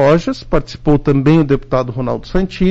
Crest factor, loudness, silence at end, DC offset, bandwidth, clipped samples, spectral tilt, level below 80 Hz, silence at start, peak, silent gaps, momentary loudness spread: 10 dB; -15 LUFS; 0 s; under 0.1%; 7.8 kHz; under 0.1%; -8 dB/octave; -28 dBFS; 0 s; -4 dBFS; none; 8 LU